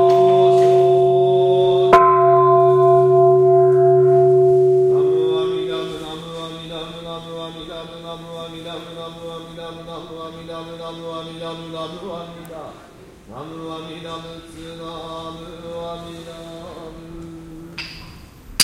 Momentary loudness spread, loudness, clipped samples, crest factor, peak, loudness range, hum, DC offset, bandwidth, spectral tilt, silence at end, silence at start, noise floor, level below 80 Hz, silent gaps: 22 LU; -14 LUFS; under 0.1%; 18 dB; 0 dBFS; 20 LU; none; under 0.1%; 12 kHz; -6 dB/octave; 0 s; 0 s; -43 dBFS; -50 dBFS; none